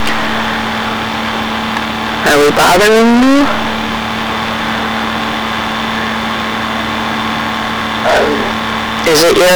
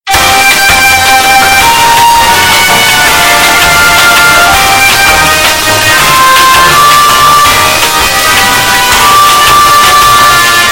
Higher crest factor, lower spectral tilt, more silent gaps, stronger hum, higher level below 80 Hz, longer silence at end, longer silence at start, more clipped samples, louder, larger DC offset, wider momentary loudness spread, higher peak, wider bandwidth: about the same, 6 dB vs 4 dB; first, -3.5 dB/octave vs -1 dB/octave; neither; neither; second, -36 dBFS vs -26 dBFS; about the same, 0 s vs 0 s; about the same, 0 s vs 0.05 s; second, under 0.1% vs 9%; second, -12 LUFS vs -3 LUFS; neither; first, 8 LU vs 2 LU; second, -6 dBFS vs 0 dBFS; about the same, over 20 kHz vs over 20 kHz